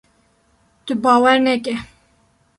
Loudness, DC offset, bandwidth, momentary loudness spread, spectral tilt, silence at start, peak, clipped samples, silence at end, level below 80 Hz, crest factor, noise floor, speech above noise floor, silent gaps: -16 LUFS; under 0.1%; 11.5 kHz; 15 LU; -4 dB/octave; 0.85 s; -2 dBFS; under 0.1%; 0.75 s; -56 dBFS; 18 dB; -59 dBFS; 44 dB; none